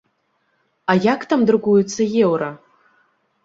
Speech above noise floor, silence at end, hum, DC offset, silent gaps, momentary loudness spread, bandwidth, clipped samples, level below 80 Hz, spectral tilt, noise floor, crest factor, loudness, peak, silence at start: 50 dB; 0.9 s; none; under 0.1%; none; 8 LU; 7.8 kHz; under 0.1%; -64 dBFS; -6 dB/octave; -67 dBFS; 18 dB; -18 LUFS; -2 dBFS; 0.9 s